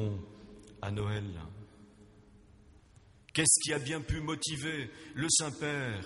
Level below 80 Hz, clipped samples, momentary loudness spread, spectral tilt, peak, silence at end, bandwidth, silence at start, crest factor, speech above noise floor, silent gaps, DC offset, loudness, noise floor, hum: -54 dBFS; under 0.1%; 21 LU; -3 dB/octave; -12 dBFS; 0 s; 11.5 kHz; 0 s; 24 dB; 27 dB; none; under 0.1%; -32 LUFS; -60 dBFS; none